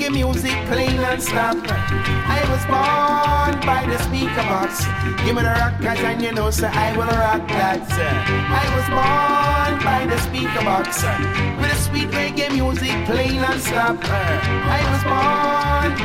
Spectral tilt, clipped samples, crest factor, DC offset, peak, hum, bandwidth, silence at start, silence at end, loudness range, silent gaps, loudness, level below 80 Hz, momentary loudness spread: -5 dB/octave; under 0.1%; 14 dB; under 0.1%; -6 dBFS; none; 16.5 kHz; 0 s; 0 s; 1 LU; none; -19 LUFS; -32 dBFS; 4 LU